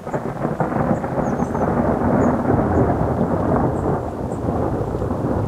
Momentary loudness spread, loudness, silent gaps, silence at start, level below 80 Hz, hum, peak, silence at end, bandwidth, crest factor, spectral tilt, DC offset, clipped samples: 6 LU; -20 LUFS; none; 0 s; -34 dBFS; none; -4 dBFS; 0 s; 13 kHz; 16 dB; -9 dB/octave; under 0.1%; under 0.1%